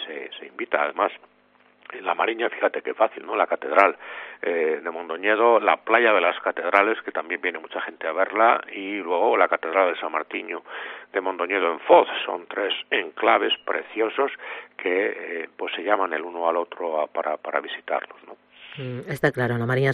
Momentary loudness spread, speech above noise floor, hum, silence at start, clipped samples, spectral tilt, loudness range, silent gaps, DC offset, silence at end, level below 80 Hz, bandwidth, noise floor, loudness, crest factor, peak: 14 LU; 36 dB; none; 0 s; under 0.1%; -6.5 dB/octave; 6 LU; none; under 0.1%; 0 s; -70 dBFS; 10 kHz; -59 dBFS; -23 LUFS; 24 dB; 0 dBFS